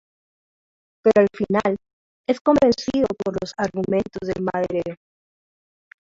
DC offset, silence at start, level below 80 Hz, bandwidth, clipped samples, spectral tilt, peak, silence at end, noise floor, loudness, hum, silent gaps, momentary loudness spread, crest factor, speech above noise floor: under 0.1%; 1.05 s; -52 dBFS; 7.8 kHz; under 0.1%; -6.5 dB/octave; -4 dBFS; 1.15 s; under -90 dBFS; -21 LUFS; none; 1.93-2.24 s, 2.41-2.45 s; 10 LU; 20 dB; over 70 dB